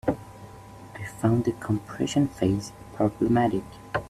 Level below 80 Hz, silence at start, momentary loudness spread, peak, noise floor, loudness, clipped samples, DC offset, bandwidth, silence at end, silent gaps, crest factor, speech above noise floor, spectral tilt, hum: -50 dBFS; 0.05 s; 21 LU; -8 dBFS; -45 dBFS; -26 LUFS; under 0.1%; under 0.1%; 14 kHz; 0 s; none; 18 dB; 19 dB; -7 dB/octave; none